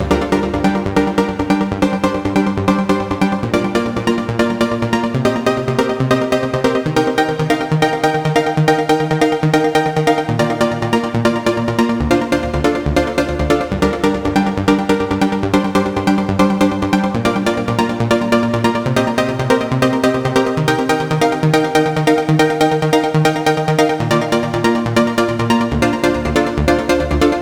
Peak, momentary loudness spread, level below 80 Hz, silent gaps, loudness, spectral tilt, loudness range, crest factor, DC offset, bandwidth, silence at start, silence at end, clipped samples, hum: 0 dBFS; 3 LU; -32 dBFS; none; -15 LUFS; -6 dB/octave; 2 LU; 14 dB; under 0.1%; 18.5 kHz; 0 s; 0 s; under 0.1%; none